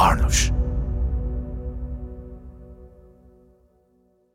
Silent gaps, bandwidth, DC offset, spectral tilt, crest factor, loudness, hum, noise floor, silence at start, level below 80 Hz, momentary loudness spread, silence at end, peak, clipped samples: none; 16 kHz; under 0.1%; -4 dB/octave; 20 dB; -25 LUFS; none; -62 dBFS; 0 s; -28 dBFS; 24 LU; 1.45 s; -4 dBFS; under 0.1%